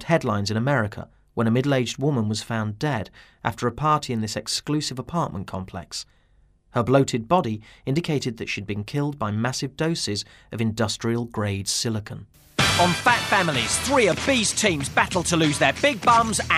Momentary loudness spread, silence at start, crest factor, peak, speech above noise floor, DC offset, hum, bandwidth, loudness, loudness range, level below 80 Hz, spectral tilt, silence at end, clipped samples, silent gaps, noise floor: 12 LU; 0 s; 20 dB; -4 dBFS; 36 dB; under 0.1%; none; 15.5 kHz; -23 LUFS; 6 LU; -50 dBFS; -4 dB/octave; 0 s; under 0.1%; none; -59 dBFS